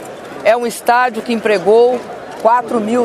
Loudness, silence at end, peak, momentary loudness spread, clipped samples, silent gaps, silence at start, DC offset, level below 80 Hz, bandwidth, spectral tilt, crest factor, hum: -14 LUFS; 0 s; 0 dBFS; 9 LU; under 0.1%; none; 0 s; under 0.1%; -60 dBFS; 15 kHz; -4.5 dB/octave; 14 dB; none